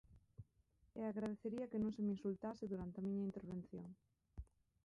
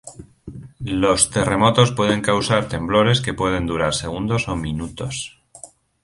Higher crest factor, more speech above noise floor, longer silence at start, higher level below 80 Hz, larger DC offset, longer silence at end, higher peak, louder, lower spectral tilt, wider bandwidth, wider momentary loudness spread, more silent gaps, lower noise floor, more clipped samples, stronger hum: second, 14 dB vs 20 dB; first, 32 dB vs 25 dB; about the same, 0.1 s vs 0.05 s; second, -68 dBFS vs -40 dBFS; neither; about the same, 0.4 s vs 0.35 s; second, -32 dBFS vs -2 dBFS; second, -46 LUFS vs -19 LUFS; first, -9 dB/octave vs -4.5 dB/octave; second, 7.2 kHz vs 11.5 kHz; first, 21 LU vs 16 LU; neither; first, -77 dBFS vs -44 dBFS; neither; neither